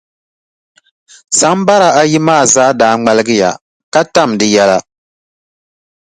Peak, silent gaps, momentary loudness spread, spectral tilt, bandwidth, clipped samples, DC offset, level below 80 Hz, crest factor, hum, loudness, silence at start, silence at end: 0 dBFS; 3.61-3.92 s; 7 LU; -3.5 dB/octave; 11.5 kHz; under 0.1%; under 0.1%; -52 dBFS; 12 dB; none; -10 LUFS; 1.3 s; 1.35 s